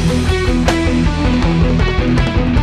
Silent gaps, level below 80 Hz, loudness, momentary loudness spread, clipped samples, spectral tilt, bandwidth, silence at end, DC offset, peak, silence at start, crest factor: none; -18 dBFS; -14 LUFS; 1 LU; under 0.1%; -6.5 dB/octave; 12.5 kHz; 0 s; under 0.1%; -4 dBFS; 0 s; 10 dB